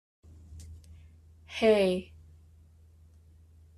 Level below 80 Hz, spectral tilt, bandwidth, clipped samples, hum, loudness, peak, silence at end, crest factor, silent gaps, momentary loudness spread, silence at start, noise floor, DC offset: -58 dBFS; -5.5 dB/octave; 13 kHz; under 0.1%; none; -27 LUFS; -12 dBFS; 1.75 s; 22 dB; none; 28 LU; 0.5 s; -57 dBFS; under 0.1%